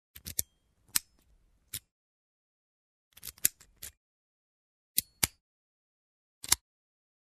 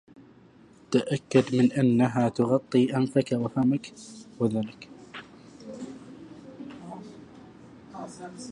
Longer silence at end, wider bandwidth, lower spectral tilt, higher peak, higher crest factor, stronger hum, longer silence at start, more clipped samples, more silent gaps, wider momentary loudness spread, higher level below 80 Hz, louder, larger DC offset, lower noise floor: first, 0.8 s vs 0 s; first, 14 kHz vs 11 kHz; second, 0 dB/octave vs -7 dB/octave; first, 0 dBFS vs -8 dBFS; first, 40 dB vs 20 dB; neither; second, 0.15 s vs 0.9 s; neither; first, 1.91-3.11 s, 3.97-4.95 s, 5.41-6.41 s vs none; second, 18 LU vs 23 LU; about the same, -62 dBFS vs -66 dBFS; second, -32 LUFS vs -25 LUFS; neither; first, -69 dBFS vs -54 dBFS